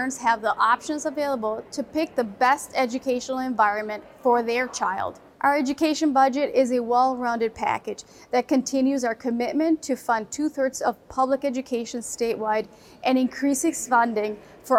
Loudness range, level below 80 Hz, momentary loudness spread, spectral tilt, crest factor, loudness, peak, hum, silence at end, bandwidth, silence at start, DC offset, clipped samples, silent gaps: 3 LU; -62 dBFS; 8 LU; -3.5 dB/octave; 16 dB; -24 LUFS; -8 dBFS; none; 0 s; 16 kHz; 0 s; under 0.1%; under 0.1%; none